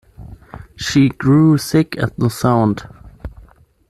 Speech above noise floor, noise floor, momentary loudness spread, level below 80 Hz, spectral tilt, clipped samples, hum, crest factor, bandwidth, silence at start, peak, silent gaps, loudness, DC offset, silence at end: 32 dB; -47 dBFS; 23 LU; -42 dBFS; -6.5 dB/octave; under 0.1%; none; 14 dB; 13.5 kHz; 0.2 s; -2 dBFS; none; -15 LUFS; under 0.1%; 0.6 s